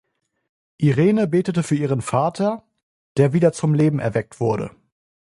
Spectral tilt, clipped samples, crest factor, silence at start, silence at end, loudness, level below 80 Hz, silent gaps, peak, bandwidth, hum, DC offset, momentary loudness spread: -7.5 dB/octave; under 0.1%; 18 dB; 0.8 s; 0.65 s; -20 LUFS; -56 dBFS; 2.83-3.15 s; -2 dBFS; 11.5 kHz; none; under 0.1%; 8 LU